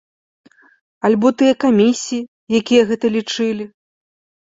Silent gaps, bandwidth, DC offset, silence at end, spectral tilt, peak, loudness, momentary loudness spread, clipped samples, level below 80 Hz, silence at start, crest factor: 2.28-2.47 s; 7.8 kHz; under 0.1%; 0.75 s; -5 dB/octave; -2 dBFS; -16 LUFS; 11 LU; under 0.1%; -60 dBFS; 1.05 s; 16 dB